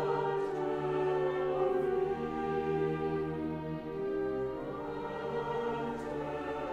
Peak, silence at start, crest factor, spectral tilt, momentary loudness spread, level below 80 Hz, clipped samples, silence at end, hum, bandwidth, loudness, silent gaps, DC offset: -20 dBFS; 0 s; 14 dB; -8 dB/octave; 7 LU; -58 dBFS; under 0.1%; 0 s; none; 8 kHz; -34 LUFS; none; under 0.1%